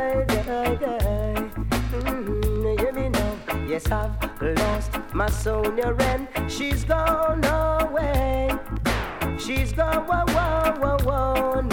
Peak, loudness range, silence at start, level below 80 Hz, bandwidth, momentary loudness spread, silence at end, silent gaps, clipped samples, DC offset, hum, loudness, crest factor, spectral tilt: -6 dBFS; 2 LU; 0 s; -30 dBFS; 18 kHz; 6 LU; 0 s; none; under 0.1%; under 0.1%; none; -24 LUFS; 16 dB; -6 dB/octave